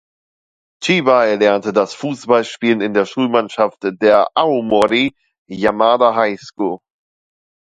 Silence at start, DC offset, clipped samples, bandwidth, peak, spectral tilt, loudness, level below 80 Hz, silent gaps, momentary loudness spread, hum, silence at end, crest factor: 0.8 s; under 0.1%; under 0.1%; 11 kHz; 0 dBFS; -5 dB/octave; -15 LUFS; -58 dBFS; 5.38-5.45 s; 10 LU; none; 1 s; 16 dB